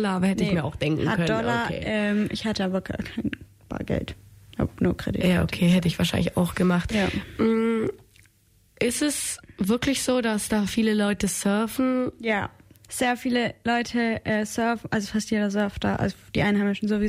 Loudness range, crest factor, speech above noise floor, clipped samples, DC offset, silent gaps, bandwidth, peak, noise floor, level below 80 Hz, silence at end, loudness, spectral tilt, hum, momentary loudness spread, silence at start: 3 LU; 12 dB; 37 dB; under 0.1%; under 0.1%; none; 16 kHz; -12 dBFS; -61 dBFS; -46 dBFS; 0 s; -25 LUFS; -5 dB/octave; none; 8 LU; 0 s